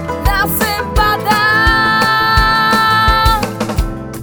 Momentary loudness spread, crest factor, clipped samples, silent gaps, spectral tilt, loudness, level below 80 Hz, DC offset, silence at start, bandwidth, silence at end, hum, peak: 8 LU; 12 dB; under 0.1%; none; -4 dB/octave; -12 LUFS; -22 dBFS; under 0.1%; 0 s; over 20 kHz; 0 s; none; 0 dBFS